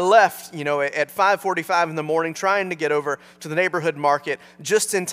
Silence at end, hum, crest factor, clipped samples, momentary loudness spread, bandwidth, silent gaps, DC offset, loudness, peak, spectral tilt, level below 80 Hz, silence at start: 0 s; none; 20 dB; under 0.1%; 8 LU; 16 kHz; none; under 0.1%; -21 LUFS; -2 dBFS; -3.5 dB/octave; -74 dBFS; 0 s